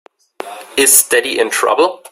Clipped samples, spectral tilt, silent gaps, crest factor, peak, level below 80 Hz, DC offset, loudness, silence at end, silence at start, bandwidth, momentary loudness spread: 0.1%; 0.5 dB/octave; none; 14 dB; 0 dBFS; -58 dBFS; under 0.1%; -11 LUFS; 0.15 s; 0.4 s; over 20 kHz; 21 LU